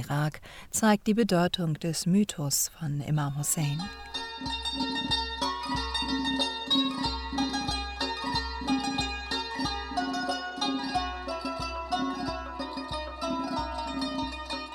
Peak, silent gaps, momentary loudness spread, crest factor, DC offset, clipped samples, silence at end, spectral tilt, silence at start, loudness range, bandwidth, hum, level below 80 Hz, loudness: -12 dBFS; none; 9 LU; 18 dB; under 0.1%; under 0.1%; 0 s; -4 dB/octave; 0 s; 5 LU; 17.5 kHz; none; -46 dBFS; -30 LUFS